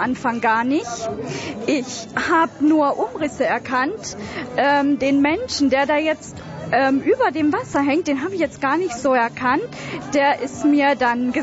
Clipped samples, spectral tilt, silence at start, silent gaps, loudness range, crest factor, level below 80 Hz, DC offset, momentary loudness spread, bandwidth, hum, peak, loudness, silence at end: under 0.1%; -4.5 dB/octave; 0 s; none; 2 LU; 12 dB; -54 dBFS; under 0.1%; 10 LU; 8 kHz; none; -6 dBFS; -20 LUFS; 0 s